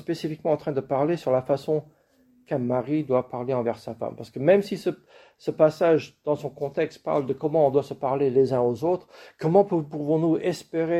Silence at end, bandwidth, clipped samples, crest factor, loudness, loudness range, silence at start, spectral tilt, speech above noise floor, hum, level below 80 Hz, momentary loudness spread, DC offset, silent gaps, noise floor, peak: 0 s; 13.5 kHz; under 0.1%; 18 dB; -25 LUFS; 3 LU; 0.1 s; -7.5 dB/octave; 37 dB; none; -66 dBFS; 9 LU; under 0.1%; none; -61 dBFS; -6 dBFS